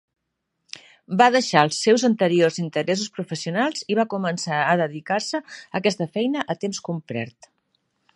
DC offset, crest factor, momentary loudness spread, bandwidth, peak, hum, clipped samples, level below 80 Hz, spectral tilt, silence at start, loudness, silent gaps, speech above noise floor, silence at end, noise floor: under 0.1%; 22 dB; 13 LU; 11.5 kHz; 0 dBFS; none; under 0.1%; -72 dBFS; -4.5 dB/octave; 1.1 s; -22 LUFS; none; 56 dB; 0.85 s; -78 dBFS